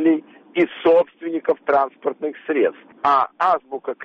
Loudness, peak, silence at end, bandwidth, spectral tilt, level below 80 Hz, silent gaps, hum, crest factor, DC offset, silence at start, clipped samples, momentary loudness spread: -20 LUFS; -6 dBFS; 0 s; 6.2 kHz; -6.5 dB/octave; -66 dBFS; none; none; 14 dB; under 0.1%; 0 s; under 0.1%; 9 LU